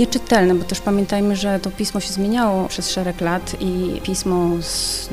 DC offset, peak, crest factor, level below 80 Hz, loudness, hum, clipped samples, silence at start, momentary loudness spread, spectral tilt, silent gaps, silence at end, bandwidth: under 0.1%; 0 dBFS; 18 dB; -36 dBFS; -20 LUFS; none; under 0.1%; 0 s; 6 LU; -4.5 dB/octave; none; 0 s; 16 kHz